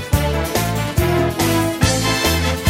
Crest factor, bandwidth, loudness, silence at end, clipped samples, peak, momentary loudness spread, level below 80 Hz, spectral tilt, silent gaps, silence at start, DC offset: 16 dB; 16.5 kHz; -17 LUFS; 0 s; under 0.1%; 0 dBFS; 3 LU; -28 dBFS; -4.5 dB/octave; none; 0 s; under 0.1%